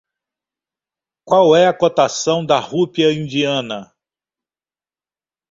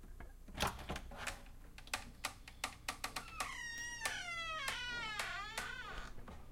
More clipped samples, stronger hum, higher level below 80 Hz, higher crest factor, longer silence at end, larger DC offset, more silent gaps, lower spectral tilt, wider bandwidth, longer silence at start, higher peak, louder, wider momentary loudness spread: neither; neither; second, -62 dBFS vs -54 dBFS; second, 18 dB vs 24 dB; first, 1.65 s vs 0 s; neither; neither; first, -4.5 dB/octave vs -2 dB/octave; second, 7.8 kHz vs 16.5 kHz; first, 1.25 s vs 0 s; first, 0 dBFS vs -20 dBFS; first, -15 LUFS vs -43 LUFS; second, 8 LU vs 13 LU